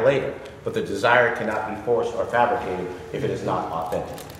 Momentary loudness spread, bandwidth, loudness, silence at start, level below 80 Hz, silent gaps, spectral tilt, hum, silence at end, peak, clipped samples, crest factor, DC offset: 11 LU; 16 kHz; -24 LUFS; 0 s; -52 dBFS; none; -5.5 dB/octave; none; 0 s; -2 dBFS; under 0.1%; 20 dB; under 0.1%